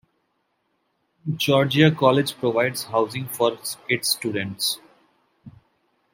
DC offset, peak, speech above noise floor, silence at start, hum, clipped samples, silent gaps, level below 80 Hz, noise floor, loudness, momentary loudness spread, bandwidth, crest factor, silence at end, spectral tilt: under 0.1%; -2 dBFS; 50 dB; 1.25 s; none; under 0.1%; none; -64 dBFS; -72 dBFS; -22 LUFS; 11 LU; 16.5 kHz; 22 dB; 0.65 s; -4.5 dB/octave